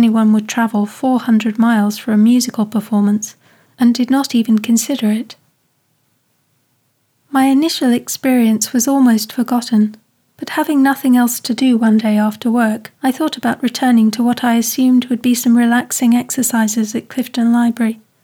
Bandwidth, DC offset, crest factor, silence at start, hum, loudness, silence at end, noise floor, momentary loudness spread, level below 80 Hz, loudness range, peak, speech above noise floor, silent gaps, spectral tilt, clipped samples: 18 kHz; under 0.1%; 12 dB; 0 s; none; -14 LUFS; 0.3 s; -62 dBFS; 7 LU; -74 dBFS; 4 LU; -4 dBFS; 49 dB; none; -4.5 dB/octave; under 0.1%